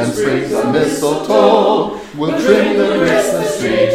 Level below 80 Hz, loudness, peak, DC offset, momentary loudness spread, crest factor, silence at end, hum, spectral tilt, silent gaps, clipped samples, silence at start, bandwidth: -46 dBFS; -14 LUFS; 0 dBFS; under 0.1%; 6 LU; 14 dB; 0 s; none; -5 dB/octave; none; under 0.1%; 0 s; 16 kHz